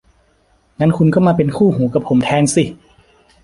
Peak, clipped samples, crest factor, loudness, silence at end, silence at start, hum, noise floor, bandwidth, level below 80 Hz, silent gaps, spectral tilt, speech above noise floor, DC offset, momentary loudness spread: -2 dBFS; under 0.1%; 14 dB; -15 LUFS; 0.7 s; 0.8 s; none; -56 dBFS; 11.5 kHz; -46 dBFS; none; -6.5 dB/octave; 43 dB; under 0.1%; 5 LU